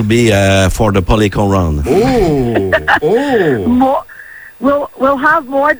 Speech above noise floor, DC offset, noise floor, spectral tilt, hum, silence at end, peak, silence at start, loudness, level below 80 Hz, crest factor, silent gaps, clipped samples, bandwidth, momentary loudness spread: 22 dB; under 0.1%; -33 dBFS; -6 dB/octave; none; 0 s; 0 dBFS; 0 s; -12 LUFS; -26 dBFS; 12 dB; none; under 0.1%; over 20 kHz; 5 LU